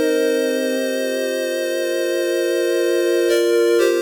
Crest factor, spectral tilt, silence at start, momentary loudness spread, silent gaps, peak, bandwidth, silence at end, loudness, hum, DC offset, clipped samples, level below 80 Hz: 12 dB; -1.5 dB/octave; 0 s; 5 LU; none; -6 dBFS; over 20 kHz; 0 s; -19 LUFS; none; under 0.1%; under 0.1%; -66 dBFS